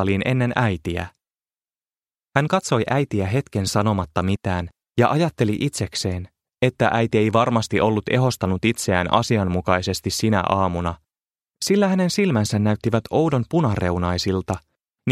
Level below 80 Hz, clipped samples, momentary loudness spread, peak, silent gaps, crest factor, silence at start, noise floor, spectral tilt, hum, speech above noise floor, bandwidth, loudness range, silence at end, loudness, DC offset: -46 dBFS; under 0.1%; 8 LU; 0 dBFS; 1.98-2.02 s; 20 dB; 0 s; under -90 dBFS; -5.5 dB/octave; none; over 70 dB; 15 kHz; 3 LU; 0 s; -21 LUFS; under 0.1%